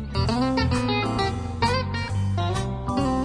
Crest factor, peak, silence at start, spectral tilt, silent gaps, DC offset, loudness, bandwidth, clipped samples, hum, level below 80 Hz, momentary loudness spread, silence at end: 14 dB; -10 dBFS; 0 s; -6 dB/octave; none; under 0.1%; -25 LUFS; 10.5 kHz; under 0.1%; none; -36 dBFS; 4 LU; 0 s